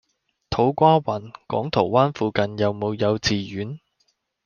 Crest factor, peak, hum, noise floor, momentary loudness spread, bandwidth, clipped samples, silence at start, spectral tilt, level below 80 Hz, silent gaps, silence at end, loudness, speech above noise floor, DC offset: 20 dB; -2 dBFS; none; -69 dBFS; 13 LU; 7.2 kHz; under 0.1%; 0.5 s; -6 dB/octave; -52 dBFS; none; 0.7 s; -22 LUFS; 48 dB; under 0.1%